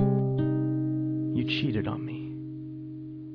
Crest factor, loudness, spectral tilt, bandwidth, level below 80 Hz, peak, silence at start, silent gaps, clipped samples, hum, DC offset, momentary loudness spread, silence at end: 14 dB; -30 LUFS; -9 dB/octave; 5.4 kHz; -54 dBFS; -14 dBFS; 0 s; none; under 0.1%; none; under 0.1%; 13 LU; 0 s